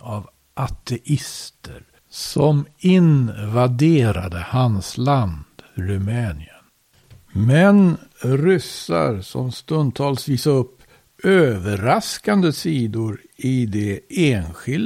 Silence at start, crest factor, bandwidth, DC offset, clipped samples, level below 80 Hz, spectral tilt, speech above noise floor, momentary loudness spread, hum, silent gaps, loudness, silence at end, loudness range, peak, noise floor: 0.05 s; 18 dB; 16 kHz; under 0.1%; under 0.1%; -44 dBFS; -6.5 dB/octave; 38 dB; 14 LU; none; none; -19 LUFS; 0 s; 3 LU; -2 dBFS; -57 dBFS